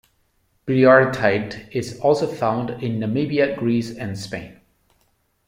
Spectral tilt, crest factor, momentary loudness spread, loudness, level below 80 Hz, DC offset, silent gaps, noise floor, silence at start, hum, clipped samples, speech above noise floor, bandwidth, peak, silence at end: -6.5 dB/octave; 18 dB; 16 LU; -20 LUFS; -56 dBFS; under 0.1%; none; -65 dBFS; 0.65 s; none; under 0.1%; 46 dB; 16 kHz; -2 dBFS; 0.95 s